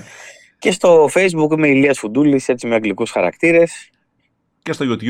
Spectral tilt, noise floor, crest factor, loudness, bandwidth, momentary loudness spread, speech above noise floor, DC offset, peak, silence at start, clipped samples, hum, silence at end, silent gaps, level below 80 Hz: -5.5 dB/octave; -66 dBFS; 14 dB; -15 LUFS; 13.5 kHz; 10 LU; 51 dB; under 0.1%; -2 dBFS; 0.2 s; under 0.1%; none; 0 s; none; -60 dBFS